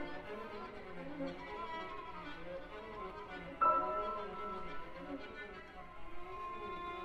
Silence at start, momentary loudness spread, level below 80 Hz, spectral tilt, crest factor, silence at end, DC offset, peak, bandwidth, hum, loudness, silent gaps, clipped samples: 0 s; 15 LU; -60 dBFS; -6 dB/octave; 22 dB; 0 s; under 0.1%; -20 dBFS; 11.5 kHz; none; -42 LUFS; none; under 0.1%